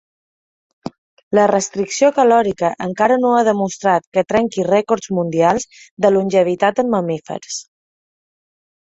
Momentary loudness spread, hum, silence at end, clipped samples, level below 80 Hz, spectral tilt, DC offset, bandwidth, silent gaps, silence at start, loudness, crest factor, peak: 13 LU; none; 1.2 s; under 0.1%; -56 dBFS; -5 dB/octave; under 0.1%; 8.4 kHz; 0.98-1.17 s, 1.23-1.31 s, 4.07-4.12 s, 5.91-5.97 s; 0.85 s; -16 LUFS; 16 dB; -2 dBFS